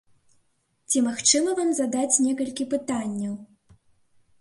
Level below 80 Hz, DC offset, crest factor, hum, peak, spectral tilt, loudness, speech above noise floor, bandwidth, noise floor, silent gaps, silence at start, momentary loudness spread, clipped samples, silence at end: -68 dBFS; under 0.1%; 20 dB; none; -6 dBFS; -2.5 dB/octave; -23 LUFS; 45 dB; 11.5 kHz; -69 dBFS; none; 0.9 s; 11 LU; under 0.1%; 0.95 s